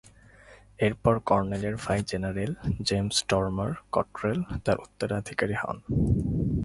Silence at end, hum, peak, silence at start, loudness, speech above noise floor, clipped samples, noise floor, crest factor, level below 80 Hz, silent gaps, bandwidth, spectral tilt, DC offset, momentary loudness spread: 0 s; none; -6 dBFS; 0.5 s; -28 LUFS; 26 dB; under 0.1%; -53 dBFS; 22 dB; -42 dBFS; none; 11.5 kHz; -5.5 dB/octave; under 0.1%; 6 LU